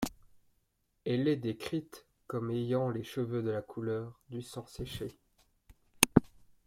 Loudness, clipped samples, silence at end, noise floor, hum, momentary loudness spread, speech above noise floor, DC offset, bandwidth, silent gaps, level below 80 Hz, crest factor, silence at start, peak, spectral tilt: -34 LUFS; under 0.1%; 0.4 s; -77 dBFS; none; 16 LU; 41 dB; under 0.1%; 16.5 kHz; none; -58 dBFS; 36 dB; 0 s; 0 dBFS; -5 dB/octave